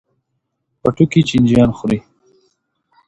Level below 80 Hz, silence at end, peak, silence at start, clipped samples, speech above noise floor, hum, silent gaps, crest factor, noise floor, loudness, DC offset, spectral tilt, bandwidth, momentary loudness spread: -42 dBFS; 1.1 s; 0 dBFS; 0.85 s; under 0.1%; 59 dB; none; none; 16 dB; -72 dBFS; -15 LUFS; under 0.1%; -7.5 dB/octave; 9.8 kHz; 8 LU